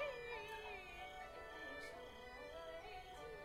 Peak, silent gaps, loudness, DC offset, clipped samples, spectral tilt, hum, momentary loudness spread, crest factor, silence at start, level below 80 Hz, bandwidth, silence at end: -34 dBFS; none; -52 LUFS; under 0.1%; under 0.1%; -3.5 dB/octave; none; 5 LU; 18 dB; 0 s; -66 dBFS; 16 kHz; 0 s